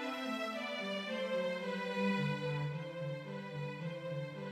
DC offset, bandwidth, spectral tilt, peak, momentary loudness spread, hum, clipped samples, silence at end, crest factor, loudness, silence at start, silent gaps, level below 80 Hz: under 0.1%; 14.5 kHz; -6 dB/octave; -24 dBFS; 8 LU; none; under 0.1%; 0 s; 14 dB; -39 LUFS; 0 s; none; -78 dBFS